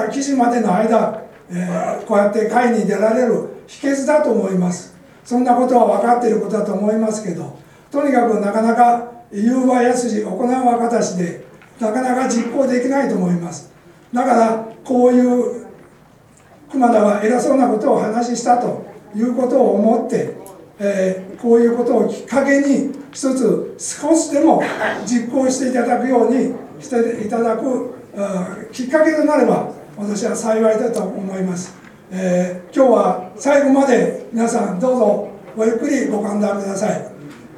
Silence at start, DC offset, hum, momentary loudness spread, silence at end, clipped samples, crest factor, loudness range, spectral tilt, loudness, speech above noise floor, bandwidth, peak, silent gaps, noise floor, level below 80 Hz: 0 s; under 0.1%; none; 11 LU; 0 s; under 0.1%; 16 dB; 2 LU; -6 dB/octave; -17 LUFS; 31 dB; 13 kHz; 0 dBFS; none; -47 dBFS; -62 dBFS